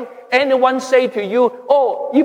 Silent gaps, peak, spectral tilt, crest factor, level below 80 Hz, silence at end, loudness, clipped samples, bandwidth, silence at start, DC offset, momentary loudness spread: none; -2 dBFS; -4.5 dB/octave; 14 dB; -76 dBFS; 0 s; -15 LUFS; under 0.1%; 10.5 kHz; 0 s; under 0.1%; 3 LU